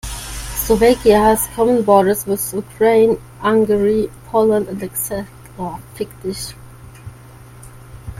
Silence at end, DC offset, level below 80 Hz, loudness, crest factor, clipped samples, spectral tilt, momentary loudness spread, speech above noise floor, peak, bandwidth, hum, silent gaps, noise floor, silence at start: 0 s; under 0.1%; -38 dBFS; -16 LUFS; 16 dB; under 0.1%; -5 dB/octave; 16 LU; 24 dB; 0 dBFS; 16.5 kHz; none; none; -39 dBFS; 0.05 s